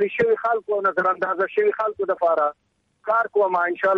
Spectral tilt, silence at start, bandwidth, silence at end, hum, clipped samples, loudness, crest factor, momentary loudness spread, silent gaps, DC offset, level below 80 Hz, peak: -7 dB/octave; 0 s; 6 kHz; 0 s; none; under 0.1%; -21 LUFS; 12 dB; 4 LU; none; under 0.1%; -68 dBFS; -8 dBFS